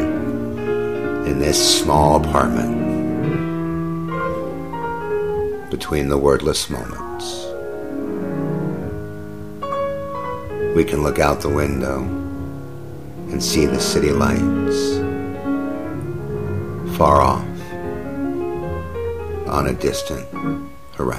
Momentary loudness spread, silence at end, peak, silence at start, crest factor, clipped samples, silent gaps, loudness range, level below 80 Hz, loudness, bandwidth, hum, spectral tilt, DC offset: 13 LU; 0 s; 0 dBFS; 0 s; 20 dB; under 0.1%; none; 7 LU; -36 dBFS; -21 LUFS; 15.5 kHz; none; -5 dB/octave; 2%